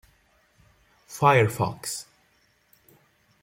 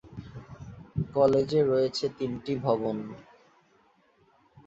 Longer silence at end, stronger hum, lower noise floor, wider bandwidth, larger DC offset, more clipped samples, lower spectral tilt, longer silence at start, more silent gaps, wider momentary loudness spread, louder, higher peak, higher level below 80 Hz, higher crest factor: about the same, 1.4 s vs 1.45 s; neither; about the same, -65 dBFS vs -65 dBFS; first, 16.5 kHz vs 8 kHz; neither; neither; second, -5 dB/octave vs -7 dB/octave; first, 1.1 s vs 0.05 s; neither; second, 16 LU vs 22 LU; first, -23 LUFS vs -27 LUFS; about the same, -6 dBFS vs -8 dBFS; second, -64 dBFS vs -56 dBFS; about the same, 22 dB vs 20 dB